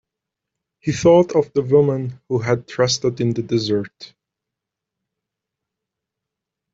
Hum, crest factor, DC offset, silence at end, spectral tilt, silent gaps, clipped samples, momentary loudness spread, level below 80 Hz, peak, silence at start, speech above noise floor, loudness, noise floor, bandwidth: none; 18 dB; under 0.1%; 2.7 s; -5.5 dB/octave; none; under 0.1%; 11 LU; -56 dBFS; -4 dBFS; 0.85 s; 66 dB; -19 LUFS; -84 dBFS; 7.8 kHz